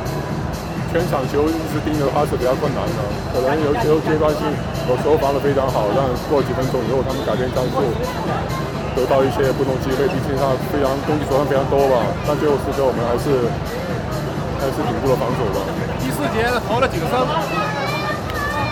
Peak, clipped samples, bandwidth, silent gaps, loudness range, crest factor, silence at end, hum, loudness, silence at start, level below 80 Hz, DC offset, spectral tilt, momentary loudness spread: -6 dBFS; under 0.1%; 17.5 kHz; none; 2 LU; 12 dB; 0 s; none; -19 LUFS; 0 s; -34 dBFS; under 0.1%; -6.5 dB/octave; 6 LU